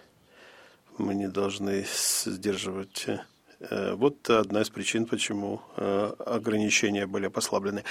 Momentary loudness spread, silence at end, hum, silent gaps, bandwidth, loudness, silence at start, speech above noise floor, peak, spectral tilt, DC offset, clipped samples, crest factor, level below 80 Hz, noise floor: 10 LU; 0 s; none; none; 17 kHz; -28 LUFS; 0.4 s; 27 dB; -8 dBFS; -3.5 dB/octave; under 0.1%; under 0.1%; 20 dB; -68 dBFS; -56 dBFS